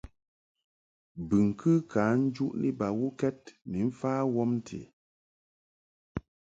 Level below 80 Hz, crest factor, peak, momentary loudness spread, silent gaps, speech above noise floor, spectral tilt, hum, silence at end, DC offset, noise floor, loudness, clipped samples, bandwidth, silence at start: -58 dBFS; 18 dB; -12 dBFS; 16 LU; 4.93-6.15 s; over 61 dB; -8.5 dB/octave; none; 0.35 s; under 0.1%; under -90 dBFS; -29 LUFS; under 0.1%; 7.8 kHz; 1.15 s